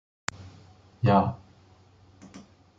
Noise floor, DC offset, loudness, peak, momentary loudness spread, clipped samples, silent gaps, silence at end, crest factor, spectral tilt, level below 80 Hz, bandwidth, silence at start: -57 dBFS; under 0.1%; -26 LUFS; -8 dBFS; 27 LU; under 0.1%; none; 0.4 s; 22 dB; -7 dB/octave; -62 dBFS; 9.2 kHz; 0.4 s